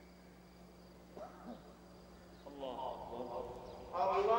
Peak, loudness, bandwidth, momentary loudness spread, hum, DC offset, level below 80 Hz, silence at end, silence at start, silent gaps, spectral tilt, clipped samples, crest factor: -22 dBFS; -43 LUFS; 16 kHz; 21 LU; none; under 0.1%; -64 dBFS; 0 s; 0 s; none; -6 dB/octave; under 0.1%; 20 dB